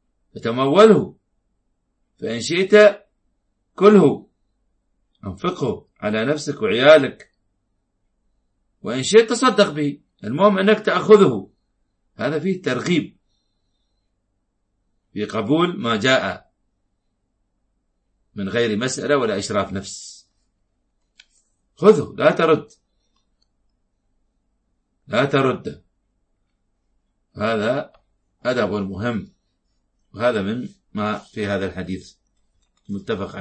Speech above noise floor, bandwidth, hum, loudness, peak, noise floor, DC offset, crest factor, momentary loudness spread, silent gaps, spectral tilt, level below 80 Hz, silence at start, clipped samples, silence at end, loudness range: 53 dB; 8.8 kHz; none; -18 LUFS; 0 dBFS; -71 dBFS; under 0.1%; 20 dB; 19 LU; none; -5.5 dB/octave; -60 dBFS; 0.35 s; under 0.1%; 0 s; 9 LU